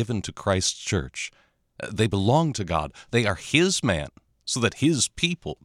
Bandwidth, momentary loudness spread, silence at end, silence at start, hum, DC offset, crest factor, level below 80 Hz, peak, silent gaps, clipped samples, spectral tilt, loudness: 15.5 kHz; 13 LU; 0.1 s; 0 s; none; under 0.1%; 20 dB; -46 dBFS; -4 dBFS; none; under 0.1%; -4 dB/octave; -24 LUFS